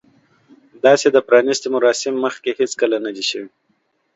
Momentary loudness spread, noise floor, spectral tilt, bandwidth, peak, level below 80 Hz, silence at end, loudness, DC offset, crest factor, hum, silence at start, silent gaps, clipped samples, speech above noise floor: 9 LU; -66 dBFS; -3 dB/octave; 8 kHz; 0 dBFS; -70 dBFS; 0.7 s; -17 LUFS; under 0.1%; 18 dB; none; 0.85 s; none; under 0.1%; 49 dB